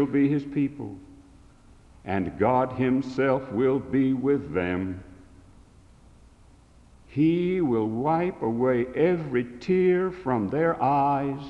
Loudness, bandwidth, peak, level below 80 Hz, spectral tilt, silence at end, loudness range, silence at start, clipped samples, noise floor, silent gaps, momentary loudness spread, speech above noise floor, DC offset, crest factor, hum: -25 LUFS; 7.6 kHz; -8 dBFS; -54 dBFS; -9 dB/octave; 0 s; 5 LU; 0 s; under 0.1%; -54 dBFS; none; 8 LU; 29 dB; under 0.1%; 16 dB; none